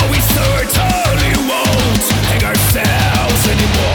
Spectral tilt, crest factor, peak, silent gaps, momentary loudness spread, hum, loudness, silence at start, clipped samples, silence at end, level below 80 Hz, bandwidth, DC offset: -4 dB/octave; 12 dB; 0 dBFS; none; 1 LU; none; -13 LUFS; 0 s; under 0.1%; 0 s; -22 dBFS; over 20 kHz; under 0.1%